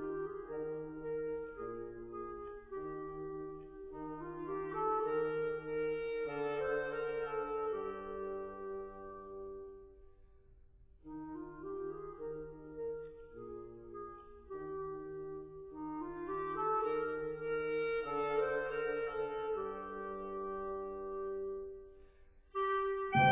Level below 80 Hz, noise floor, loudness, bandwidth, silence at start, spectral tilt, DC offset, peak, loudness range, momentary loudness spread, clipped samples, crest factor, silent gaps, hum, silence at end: -64 dBFS; -61 dBFS; -40 LUFS; 3.9 kHz; 0 s; -4.5 dB/octave; under 0.1%; -18 dBFS; 10 LU; 14 LU; under 0.1%; 22 dB; none; none; 0 s